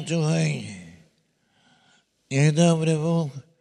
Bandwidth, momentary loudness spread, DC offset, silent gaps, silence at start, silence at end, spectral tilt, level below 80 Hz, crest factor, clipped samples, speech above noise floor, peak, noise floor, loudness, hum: 11 kHz; 14 LU; under 0.1%; none; 0 s; 0.2 s; -6 dB/octave; -68 dBFS; 18 dB; under 0.1%; 46 dB; -6 dBFS; -67 dBFS; -23 LUFS; none